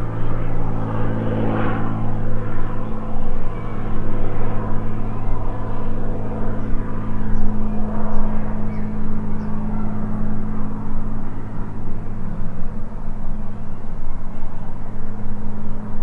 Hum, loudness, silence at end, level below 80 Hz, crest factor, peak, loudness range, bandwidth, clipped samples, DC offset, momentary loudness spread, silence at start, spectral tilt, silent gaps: none; -27 LUFS; 0 s; -22 dBFS; 12 dB; -2 dBFS; 7 LU; 2.7 kHz; under 0.1%; under 0.1%; 8 LU; 0 s; -9.5 dB/octave; none